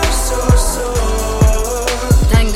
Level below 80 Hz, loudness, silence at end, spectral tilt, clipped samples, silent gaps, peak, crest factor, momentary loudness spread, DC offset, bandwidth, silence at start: -14 dBFS; -15 LUFS; 0 s; -4.5 dB/octave; under 0.1%; none; 0 dBFS; 12 dB; 5 LU; under 0.1%; 16.5 kHz; 0 s